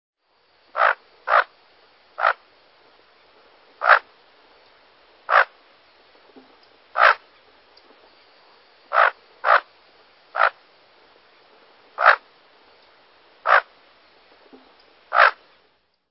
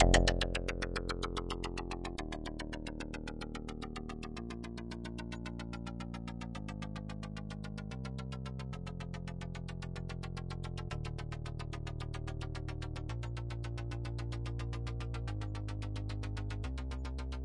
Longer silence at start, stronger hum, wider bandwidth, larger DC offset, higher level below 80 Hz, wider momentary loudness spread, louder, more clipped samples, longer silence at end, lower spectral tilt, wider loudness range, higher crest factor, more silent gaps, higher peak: first, 0.75 s vs 0 s; neither; second, 5.8 kHz vs 11.5 kHz; neither; second, -80 dBFS vs -42 dBFS; first, 15 LU vs 5 LU; first, -19 LUFS vs -41 LUFS; neither; first, 0.75 s vs 0 s; second, -3 dB/octave vs -5 dB/octave; about the same, 2 LU vs 3 LU; about the same, 24 dB vs 26 dB; neither; first, 0 dBFS vs -12 dBFS